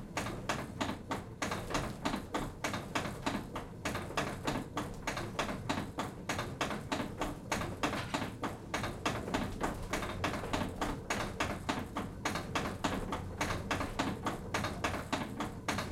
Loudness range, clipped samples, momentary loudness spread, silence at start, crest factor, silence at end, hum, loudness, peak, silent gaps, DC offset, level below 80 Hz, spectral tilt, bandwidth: 1 LU; under 0.1%; 4 LU; 0 s; 20 dB; 0 s; none; -38 LUFS; -18 dBFS; none; under 0.1%; -50 dBFS; -4.5 dB/octave; 16 kHz